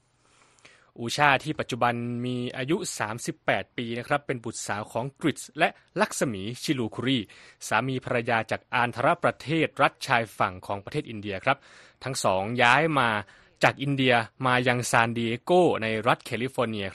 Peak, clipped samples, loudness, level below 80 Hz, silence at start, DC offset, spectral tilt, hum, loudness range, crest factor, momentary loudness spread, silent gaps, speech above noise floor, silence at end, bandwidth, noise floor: -4 dBFS; under 0.1%; -26 LUFS; -62 dBFS; 1 s; under 0.1%; -4.5 dB/octave; none; 6 LU; 24 dB; 10 LU; none; 36 dB; 0 s; 13 kHz; -62 dBFS